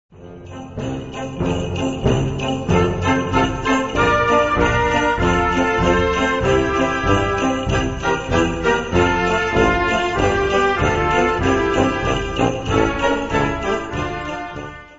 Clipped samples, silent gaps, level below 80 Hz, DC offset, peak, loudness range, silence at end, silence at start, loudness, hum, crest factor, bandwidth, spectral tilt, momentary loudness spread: under 0.1%; none; -32 dBFS; 0.4%; -2 dBFS; 3 LU; 0 s; 0.15 s; -18 LUFS; none; 16 dB; 8 kHz; -5.5 dB/octave; 9 LU